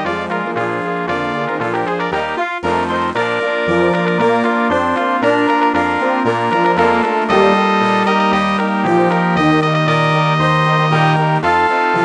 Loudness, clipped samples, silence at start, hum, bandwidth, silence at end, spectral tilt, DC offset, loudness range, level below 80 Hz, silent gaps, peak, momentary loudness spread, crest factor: -15 LUFS; under 0.1%; 0 s; none; 9.8 kHz; 0 s; -6.5 dB/octave; under 0.1%; 4 LU; -48 dBFS; none; 0 dBFS; 6 LU; 14 dB